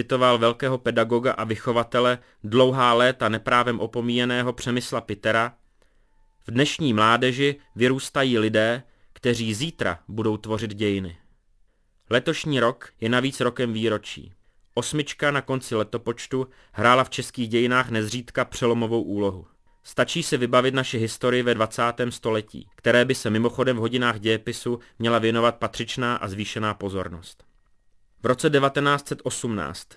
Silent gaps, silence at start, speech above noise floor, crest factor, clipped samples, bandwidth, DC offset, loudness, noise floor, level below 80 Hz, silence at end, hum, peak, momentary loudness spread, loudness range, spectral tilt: none; 0 s; 39 dB; 22 dB; under 0.1%; 11 kHz; under 0.1%; -23 LUFS; -62 dBFS; -56 dBFS; 0.15 s; none; -2 dBFS; 10 LU; 5 LU; -5 dB/octave